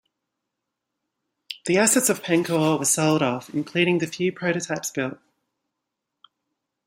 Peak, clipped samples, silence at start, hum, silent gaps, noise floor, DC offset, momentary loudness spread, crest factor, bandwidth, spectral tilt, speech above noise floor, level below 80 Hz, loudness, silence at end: -6 dBFS; under 0.1%; 1.5 s; none; none; -82 dBFS; under 0.1%; 11 LU; 20 dB; 16.5 kHz; -4 dB/octave; 60 dB; -68 dBFS; -22 LUFS; 1.7 s